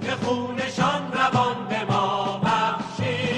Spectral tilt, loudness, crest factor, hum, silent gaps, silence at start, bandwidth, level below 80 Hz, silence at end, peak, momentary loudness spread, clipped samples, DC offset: -5.5 dB/octave; -24 LUFS; 16 dB; none; none; 0 s; 10.5 kHz; -56 dBFS; 0 s; -8 dBFS; 5 LU; under 0.1%; under 0.1%